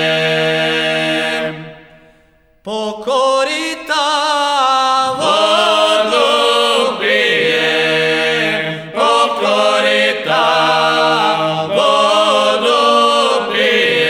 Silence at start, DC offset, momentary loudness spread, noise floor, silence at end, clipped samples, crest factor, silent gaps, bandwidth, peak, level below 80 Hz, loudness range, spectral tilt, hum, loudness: 0 s; under 0.1%; 6 LU; -51 dBFS; 0 s; under 0.1%; 14 dB; none; 16.5 kHz; 0 dBFS; -58 dBFS; 5 LU; -3 dB/octave; none; -13 LUFS